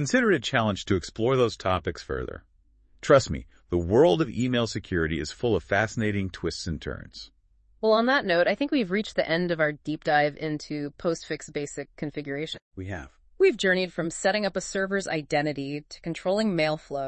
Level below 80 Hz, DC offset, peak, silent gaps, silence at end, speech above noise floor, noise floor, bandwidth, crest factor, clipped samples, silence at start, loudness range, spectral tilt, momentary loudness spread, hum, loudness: -50 dBFS; under 0.1%; -6 dBFS; 12.62-12.71 s; 0 s; 34 dB; -60 dBFS; 8.8 kHz; 20 dB; under 0.1%; 0 s; 4 LU; -5 dB/octave; 14 LU; none; -26 LUFS